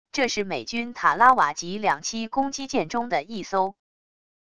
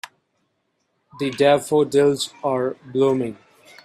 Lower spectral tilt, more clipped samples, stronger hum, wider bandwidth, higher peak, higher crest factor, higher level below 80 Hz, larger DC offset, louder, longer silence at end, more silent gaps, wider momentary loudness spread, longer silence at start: second, -3 dB/octave vs -5 dB/octave; neither; neither; second, 11 kHz vs 14.5 kHz; about the same, -4 dBFS vs -4 dBFS; about the same, 22 dB vs 18 dB; about the same, -60 dBFS vs -64 dBFS; first, 0.5% vs under 0.1%; second, -24 LUFS vs -20 LUFS; first, 0.7 s vs 0.5 s; neither; about the same, 11 LU vs 11 LU; second, 0.05 s vs 1.15 s